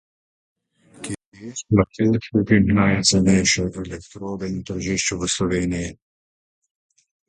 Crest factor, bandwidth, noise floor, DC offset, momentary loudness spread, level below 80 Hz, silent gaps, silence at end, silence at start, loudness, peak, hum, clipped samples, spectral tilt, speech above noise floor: 20 dB; 11 kHz; -48 dBFS; under 0.1%; 17 LU; -42 dBFS; 1.26-1.32 s; 1.35 s; 1 s; -20 LUFS; -2 dBFS; none; under 0.1%; -4.5 dB/octave; 28 dB